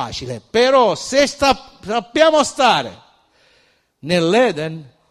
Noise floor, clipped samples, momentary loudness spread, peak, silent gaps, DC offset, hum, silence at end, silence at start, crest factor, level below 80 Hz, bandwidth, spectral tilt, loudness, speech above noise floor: -58 dBFS; under 0.1%; 14 LU; 0 dBFS; none; under 0.1%; none; 0.25 s; 0 s; 18 dB; -48 dBFS; 14.5 kHz; -4 dB/octave; -16 LUFS; 42 dB